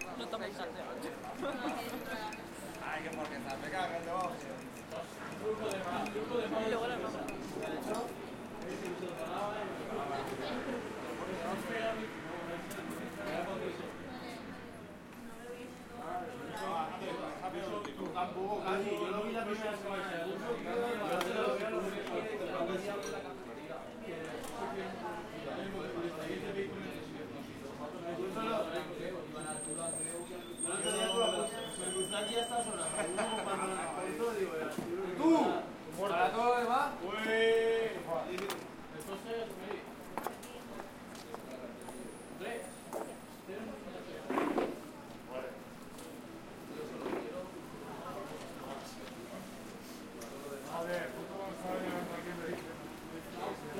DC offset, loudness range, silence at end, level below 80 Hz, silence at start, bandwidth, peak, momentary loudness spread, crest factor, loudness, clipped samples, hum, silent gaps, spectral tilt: under 0.1%; 11 LU; 0 s; -66 dBFS; 0 s; 16.5 kHz; -18 dBFS; 13 LU; 20 dB; -39 LUFS; under 0.1%; none; none; -3.5 dB/octave